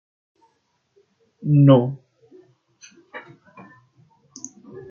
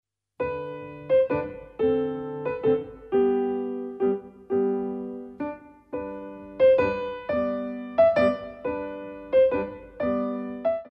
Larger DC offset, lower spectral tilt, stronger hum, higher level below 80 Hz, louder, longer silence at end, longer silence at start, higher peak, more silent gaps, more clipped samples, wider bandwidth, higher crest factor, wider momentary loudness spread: neither; about the same, -8 dB/octave vs -8.5 dB/octave; neither; second, -66 dBFS vs -56 dBFS; first, -17 LUFS vs -26 LUFS; about the same, 0.1 s vs 0 s; first, 1.45 s vs 0.4 s; first, -4 dBFS vs -10 dBFS; neither; neither; first, 7.2 kHz vs 5.8 kHz; about the same, 20 dB vs 16 dB; first, 26 LU vs 15 LU